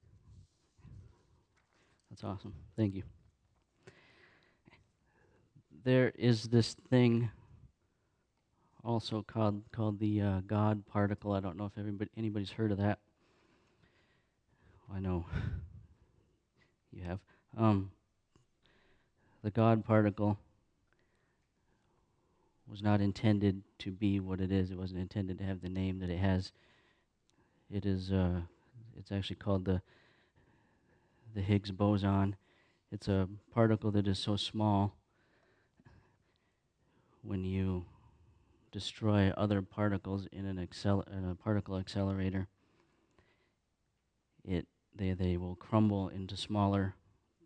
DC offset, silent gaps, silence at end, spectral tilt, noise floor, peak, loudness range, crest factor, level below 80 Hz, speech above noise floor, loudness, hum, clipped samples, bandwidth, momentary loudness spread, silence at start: under 0.1%; none; 0.55 s; -7.5 dB/octave; -80 dBFS; -14 dBFS; 10 LU; 22 dB; -60 dBFS; 47 dB; -35 LUFS; none; under 0.1%; 9.4 kHz; 14 LU; 0.3 s